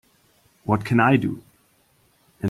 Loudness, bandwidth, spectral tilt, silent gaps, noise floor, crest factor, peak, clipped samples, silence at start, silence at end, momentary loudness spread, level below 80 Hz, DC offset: -21 LUFS; 15 kHz; -8 dB/octave; none; -62 dBFS; 20 dB; -4 dBFS; under 0.1%; 0.65 s; 0 s; 19 LU; -58 dBFS; under 0.1%